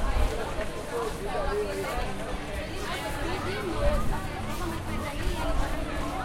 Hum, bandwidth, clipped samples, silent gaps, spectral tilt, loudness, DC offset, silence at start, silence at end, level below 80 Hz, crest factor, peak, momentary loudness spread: none; 16.5 kHz; under 0.1%; none; -5 dB/octave; -32 LUFS; under 0.1%; 0 s; 0 s; -32 dBFS; 18 dB; -12 dBFS; 5 LU